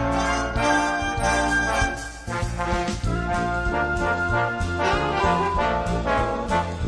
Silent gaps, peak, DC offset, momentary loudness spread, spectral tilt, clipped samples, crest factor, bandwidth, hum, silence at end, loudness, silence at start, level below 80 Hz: none; -8 dBFS; under 0.1%; 5 LU; -5 dB/octave; under 0.1%; 16 dB; 11 kHz; none; 0 s; -23 LUFS; 0 s; -32 dBFS